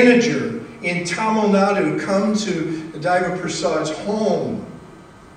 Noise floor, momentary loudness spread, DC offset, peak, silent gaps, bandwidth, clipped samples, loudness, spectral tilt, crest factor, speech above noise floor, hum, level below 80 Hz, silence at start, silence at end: -42 dBFS; 10 LU; under 0.1%; -2 dBFS; none; 10 kHz; under 0.1%; -20 LUFS; -5 dB/octave; 18 dB; 24 dB; none; -56 dBFS; 0 s; 0.1 s